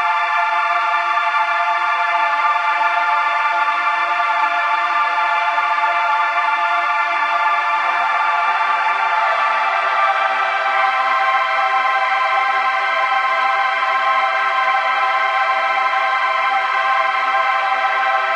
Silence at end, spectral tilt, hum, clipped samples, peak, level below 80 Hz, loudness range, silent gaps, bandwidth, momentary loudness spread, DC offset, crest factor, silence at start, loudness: 0 s; 0.5 dB/octave; none; under 0.1%; -4 dBFS; under -90 dBFS; 0 LU; none; 10.5 kHz; 1 LU; under 0.1%; 14 dB; 0 s; -16 LUFS